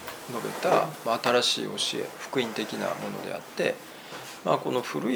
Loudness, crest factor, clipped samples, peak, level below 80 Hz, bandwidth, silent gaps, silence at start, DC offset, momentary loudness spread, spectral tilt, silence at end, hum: -28 LUFS; 20 dB; under 0.1%; -8 dBFS; -74 dBFS; over 20 kHz; none; 0 s; under 0.1%; 12 LU; -3.5 dB/octave; 0 s; none